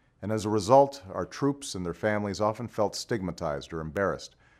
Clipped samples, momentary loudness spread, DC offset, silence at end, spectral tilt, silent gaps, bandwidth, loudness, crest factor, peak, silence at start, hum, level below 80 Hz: under 0.1%; 13 LU; under 0.1%; 0.35 s; -5.5 dB/octave; none; 14.5 kHz; -28 LUFS; 22 dB; -6 dBFS; 0.2 s; none; -56 dBFS